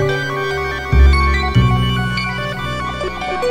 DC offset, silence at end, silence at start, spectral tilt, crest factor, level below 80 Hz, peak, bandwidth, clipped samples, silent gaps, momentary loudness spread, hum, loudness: under 0.1%; 0 s; 0 s; -6 dB/octave; 14 dB; -18 dBFS; -2 dBFS; 10.5 kHz; under 0.1%; none; 9 LU; none; -17 LUFS